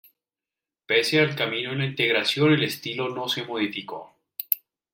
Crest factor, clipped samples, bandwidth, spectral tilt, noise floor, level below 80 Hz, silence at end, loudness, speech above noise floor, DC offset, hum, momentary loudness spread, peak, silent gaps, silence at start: 26 dB; under 0.1%; 16.5 kHz; -5 dB/octave; under -90 dBFS; -70 dBFS; 0.35 s; -24 LUFS; over 66 dB; under 0.1%; none; 14 LU; 0 dBFS; none; 0.9 s